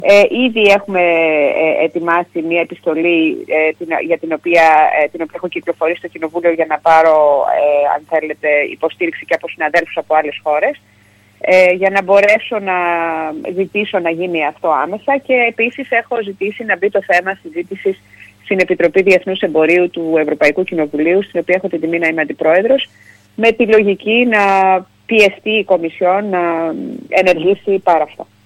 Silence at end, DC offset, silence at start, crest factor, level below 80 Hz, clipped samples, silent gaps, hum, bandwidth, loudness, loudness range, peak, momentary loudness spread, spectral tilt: 0.25 s; under 0.1%; 0 s; 14 dB; -56 dBFS; under 0.1%; none; none; 13 kHz; -14 LUFS; 3 LU; 0 dBFS; 10 LU; -5.5 dB/octave